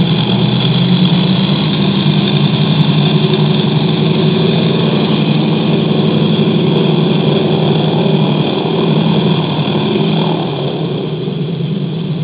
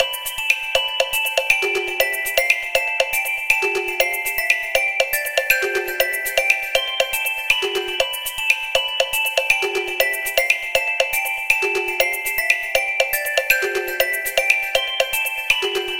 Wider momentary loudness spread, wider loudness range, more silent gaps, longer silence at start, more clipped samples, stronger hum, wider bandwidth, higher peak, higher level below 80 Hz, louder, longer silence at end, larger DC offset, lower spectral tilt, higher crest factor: first, 6 LU vs 3 LU; about the same, 3 LU vs 1 LU; neither; about the same, 0 s vs 0 s; neither; neither; second, 4 kHz vs 17 kHz; about the same, 0 dBFS vs 0 dBFS; about the same, -46 dBFS vs -50 dBFS; first, -12 LUFS vs -18 LUFS; about the same, 0 s vs 0 s; second, under 0.1% vs 0.3%; first, -11.5 dB/octave vs 0 dB/octave; second, 12 dB vs 20 dB